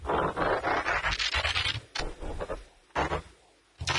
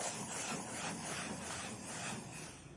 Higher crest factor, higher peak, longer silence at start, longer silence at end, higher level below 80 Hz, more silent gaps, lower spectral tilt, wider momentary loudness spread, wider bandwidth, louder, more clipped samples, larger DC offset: about the same, 18 dB vs 16 dB; first, -12 dBFS vs -28 dBFS; about the same, 0 s vs 0 s; about the same, 0 s vs 0 s; first, -44 dBFS vs -70 dBFS; neither; about the same, -3.5 dB/octave vs -2.5 dB/octave; first, 12 LU vs 5 LU; about the same, 11.5 kHz vs 11.5 kHz; first, -30 LUFS vs -42 LUFS; neither; neither